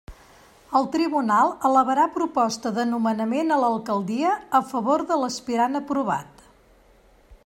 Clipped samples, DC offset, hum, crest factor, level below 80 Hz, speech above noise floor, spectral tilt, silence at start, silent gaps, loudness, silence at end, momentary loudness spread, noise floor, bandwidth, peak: under 0.1%; under 0.1%; none; 16 dB; -58 dBFS; 33 dB; -5 dB/octave; 0.1 s; none; -23 LUFS; 0.1 s; 6 LU; -55 dBFS; 16 kHz; -6 dBFS